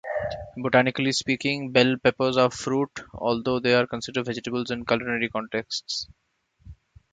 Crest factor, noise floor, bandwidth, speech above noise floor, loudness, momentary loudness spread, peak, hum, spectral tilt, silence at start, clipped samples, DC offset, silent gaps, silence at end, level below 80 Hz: 24 dB; -50 dBFS; 9.2 kHz; 25 dB; -25 LUFS; 9 LU; -2 dBFS; none; -4.5 dB/octave; 0.05 s; under 0.1%; under 0.1%; none; 0.4 s; -54 dBFS